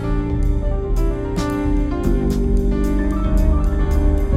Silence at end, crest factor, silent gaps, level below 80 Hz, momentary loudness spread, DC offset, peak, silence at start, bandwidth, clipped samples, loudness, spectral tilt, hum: 0 s; 12 dB; none; -18 dBFS; 3 LU; under 0.1%; -4 dBFS; 0 s; 13.5 kHz; under 0.1%; -20 LUFS; -8 dB/octave; none